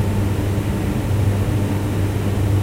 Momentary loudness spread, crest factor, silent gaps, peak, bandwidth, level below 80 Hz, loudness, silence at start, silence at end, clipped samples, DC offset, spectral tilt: 2 LU; 10 dB; none; -8 dBFS; 16 kHz; -30 dBFS; -20 LUFS; 0 s; 0 s; under 0.1%; under 0.1%; -7 dB/octave